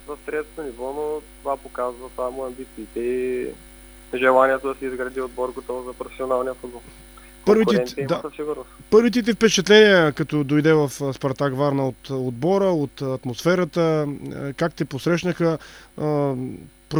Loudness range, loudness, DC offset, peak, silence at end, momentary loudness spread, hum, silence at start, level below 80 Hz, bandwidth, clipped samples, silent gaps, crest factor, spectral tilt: 9 LU; -22 LUFS; under 0.1%; 0 dBFS; 0 s; 14 LU; none; 0.05 s; -50 dBFS; over 20 kHz; under 0.1%; none; 22 dB; -5.5 dB/octave